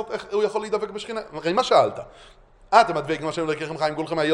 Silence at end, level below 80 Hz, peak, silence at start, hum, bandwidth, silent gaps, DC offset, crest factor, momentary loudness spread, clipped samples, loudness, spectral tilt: 0 s; -56 dBFS; 0 dBFS; 0 s; none; 11 kHz; none; under 0.1%; 22 dB; 12 LU; under 0.1%; -23 LUFS; -4.5 dB/octave